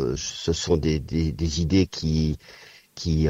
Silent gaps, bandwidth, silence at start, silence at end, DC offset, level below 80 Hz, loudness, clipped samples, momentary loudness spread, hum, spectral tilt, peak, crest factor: none; 8 kHz; 0 s; 0 s; under 0.1%; -34 dBFS; -25 LUFS; under 0.1%; 11 LU; none; -6 dB/octave; -8 dBFS; 16 dB